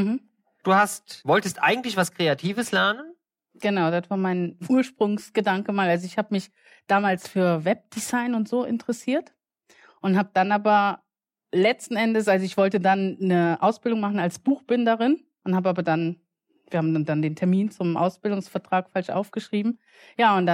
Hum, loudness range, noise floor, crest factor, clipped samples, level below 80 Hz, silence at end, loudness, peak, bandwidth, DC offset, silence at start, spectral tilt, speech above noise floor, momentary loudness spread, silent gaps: none; 3 LU; -59 dBFS; 16 dB; under 0.1%; -74 dBFS; 0 s; -24 LUFS; -8 dBFS; 16 kHz; under 0.1%; 0 s; -5.5 dB/octave; 36 dB; 8 LU; none